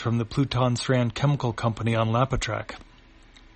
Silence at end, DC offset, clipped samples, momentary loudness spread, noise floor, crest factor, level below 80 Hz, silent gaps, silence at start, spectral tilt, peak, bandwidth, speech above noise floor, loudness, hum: 0.75 s; under 0.1%; under 0.1%; 8 LU; -52 dBFS; 18 dB; -44 dBFS; none; 0 s; -6 dB/octave; -6 dBFS; 8.8 kHz; 27 dB; -25 LUFS; none